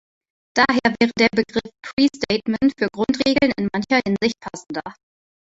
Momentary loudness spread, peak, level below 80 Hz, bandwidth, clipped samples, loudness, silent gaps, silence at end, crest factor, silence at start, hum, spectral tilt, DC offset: 13 LU; -2 dBFS; -52 dBFS; 8 kHz; under 0.1%; -20 LUFS; 1.93-1.97 s; 0.5 s; 20 dB; 0.55 s; none; -5 dB/octave; under 0.1%